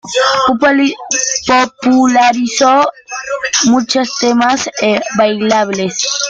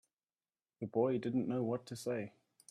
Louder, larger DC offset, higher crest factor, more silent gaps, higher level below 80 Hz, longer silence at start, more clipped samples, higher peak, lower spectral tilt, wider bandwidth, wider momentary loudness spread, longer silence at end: first, -12 LUFS vs -38 LUFS; neither; second, 12 dB vs 18 dB; neither; first, -52 dBFS vs -78 dBFS; second, 0.05 s vs 0.8 s; neither; first, 0 dBFS vs -20 dBFS; second, -2.5 dB/octave vs -7 dB/octave; second, 9.4 kHz vs 14 kHz; second, 5 LU vs 10 LU; second, 0 s vs 0.4 s